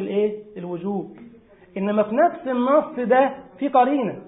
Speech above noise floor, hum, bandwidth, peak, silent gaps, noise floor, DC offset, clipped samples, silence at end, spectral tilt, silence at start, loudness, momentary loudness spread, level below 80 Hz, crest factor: 28 dB; none; 4 kHz; -4 dBFS; none; -48 dBFS; under 0.1%; under 0.1%; 0 s; -11.5 dB/octave; 0 s; -21 LUFS; 13 LU; -66 dBFS; 18 dB